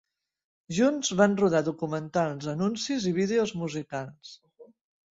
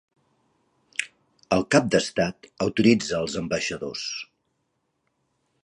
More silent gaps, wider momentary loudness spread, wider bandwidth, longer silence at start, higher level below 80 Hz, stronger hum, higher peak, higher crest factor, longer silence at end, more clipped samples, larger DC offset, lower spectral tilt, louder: neither; about the same, 13 LU vs 12 LU; second, 8 kHz vs 11.5 kHz; second, 0.7 s vs 1 s; second, -66 dBFS vs -56 dBFS; neither; second, -8 dBFS vs -4 dBFS; about the same, 20 dB vs 24 dB; second, 0.5 s vs 1.4 s; neither; neither; about the same, -5 dB/octave vs -4.5 dB/octave; about the same, -27 LUFS vs -25 LUFS